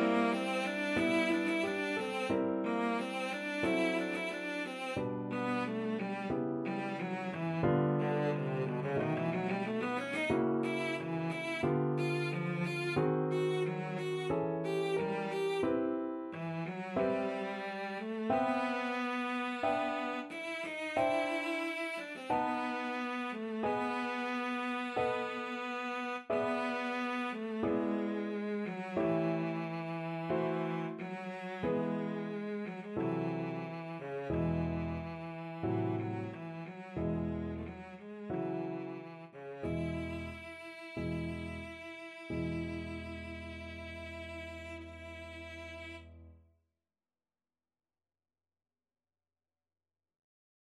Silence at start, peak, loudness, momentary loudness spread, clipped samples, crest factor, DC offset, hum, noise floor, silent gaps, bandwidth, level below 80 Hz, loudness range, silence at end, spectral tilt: 0 s; -18 dBFS; -36 LUFS; 12 LU; under 0.1%; 18 dB; under 0.1%; none; under -90 dBFS; none; 13 kHz; -60 dBFS; 8 LU; 4.4 s; -6.5 dB/octave